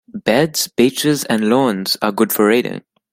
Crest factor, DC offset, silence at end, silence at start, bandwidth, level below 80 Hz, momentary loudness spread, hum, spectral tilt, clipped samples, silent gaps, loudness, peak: 16 dB; under 0.1%; 0.35 s; 0.15 s; 16 kHz; -58 dBFS; 4 LU; none; -4 dB/octave; under 0.1%; none; -16 LUFS; 0 dBFS